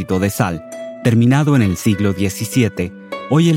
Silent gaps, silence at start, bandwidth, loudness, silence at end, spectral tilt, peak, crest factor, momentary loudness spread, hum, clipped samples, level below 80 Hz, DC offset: none; 0 s; 17 kHz; -16 LUFS; 0 s; -6.5 dB/octave; 0 dBFS; 14 dB; 12 LU; none; under 0.1%; -50 dBFS; under 0.1%